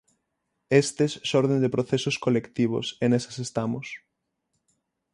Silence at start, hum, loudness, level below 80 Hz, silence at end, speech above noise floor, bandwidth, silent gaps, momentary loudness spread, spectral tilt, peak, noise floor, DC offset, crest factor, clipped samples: 0.7 s; none; -25 LUFS; -64 dBFS; 1.15 s; 55 dB; 11.5 kHz; none; 9 LU; -5.5 dB/octave; -6 dBFS; -79 dBFS; under 0.1%; 20 dB; under 0.1%